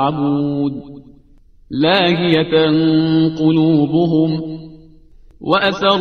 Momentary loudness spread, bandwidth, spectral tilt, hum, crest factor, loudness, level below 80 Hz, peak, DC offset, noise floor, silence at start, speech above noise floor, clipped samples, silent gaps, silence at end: 12 LU; 6.4 kHz; -7.5 dB/octave; none; 16 dB; -15 LUFS; -48 dBFS; 0 dBFS; 0.2%; -47 dBFS; 0 s; 32 dB; under 0.1%; none; 0 s